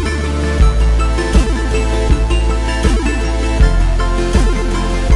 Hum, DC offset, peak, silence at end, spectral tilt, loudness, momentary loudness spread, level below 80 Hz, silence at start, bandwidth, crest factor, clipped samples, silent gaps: none; under 0.1%; 0 dBFS; 0 s; -6 dB/octave; -15 LUFS; 4 LU; -14 dBFS; 0 s; 11.5 kHz; 12 dB; under 0.1%; none